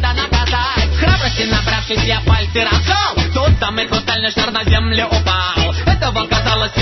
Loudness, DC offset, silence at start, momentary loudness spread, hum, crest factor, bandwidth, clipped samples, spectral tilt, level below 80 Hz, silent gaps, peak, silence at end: -15 LUFS; under 0.1%; 0 s; 2 LU; none; 14 dB; 6.2 kHz; under 0.1%; -5 dB/octave; -20 dBFS; none; -2 dBFS; 0 s